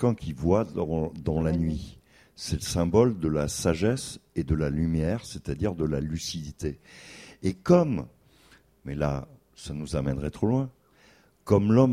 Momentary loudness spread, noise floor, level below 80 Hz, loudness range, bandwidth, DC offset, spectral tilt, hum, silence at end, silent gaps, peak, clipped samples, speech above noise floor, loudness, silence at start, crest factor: 16 LU; -59 dBFS; -42 dBFS; 4 LU; 15.5 kHz; under 0.1%; -6.5 dB/octave; none; 0 s; none; -6 dBFS; under 0.1%; 33 dB; -27 LUFS; 0 s; 20 dB